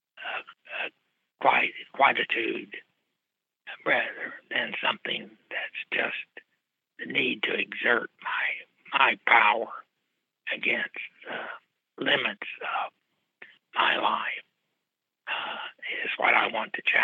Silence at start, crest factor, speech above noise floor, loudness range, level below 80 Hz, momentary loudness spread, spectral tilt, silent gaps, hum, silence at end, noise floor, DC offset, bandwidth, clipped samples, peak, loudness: 0.15 s; 26 dB; 59 dB; 6 LU; -88 dBFS; 15 LU; -5 dB/octave; none; none; 0 s; -86 dBFS; under 0.1%; 7.4 kHz; under 0.1%; -4 dBFS; -27 LUFS